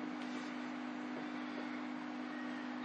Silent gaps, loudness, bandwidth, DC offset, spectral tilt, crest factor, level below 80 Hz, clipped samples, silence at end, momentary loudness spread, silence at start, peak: none; -44 LUFS; 9 kHz; under 0.1%; -4.5 dB/octave; 12 dB; under -90 dBFS; under 0.1%; 0 s; 1 LU; 0 s; -30 dBFS